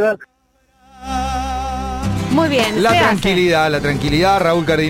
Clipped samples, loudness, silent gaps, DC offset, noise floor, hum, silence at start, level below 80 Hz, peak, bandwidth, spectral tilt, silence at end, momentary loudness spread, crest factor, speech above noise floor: under 0.1%; -16 LUFS; none; under 0.1%; -58 dBFS; none; 0 s; -32 dBFS; -4 dBFS; 16.5 kHz; -5 dB/octave; 0 s; 10 LU; 12 dB; 44 dB